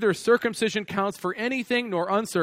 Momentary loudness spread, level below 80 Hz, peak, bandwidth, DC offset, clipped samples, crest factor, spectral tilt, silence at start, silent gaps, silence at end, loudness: 6 LU; -66 dBFS; -8 dBFS; 16 kHz; under 0.1%; under 0.1%; 16 dB; -4.5 dB/octave; 0 s; none; 0 s; -25 LUFS